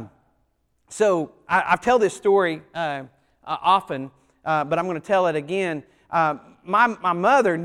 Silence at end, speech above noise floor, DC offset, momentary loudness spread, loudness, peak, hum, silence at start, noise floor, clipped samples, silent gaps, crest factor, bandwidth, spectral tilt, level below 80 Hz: 0 s; 47 dB; under 0.1%; 14 LU; -22 LUFS; -4 dBFS; none; 0 s; -68 dBFS; under 0.1%; none; 18 dB; 12 kHz; -5 dB/octave; -60 dBFS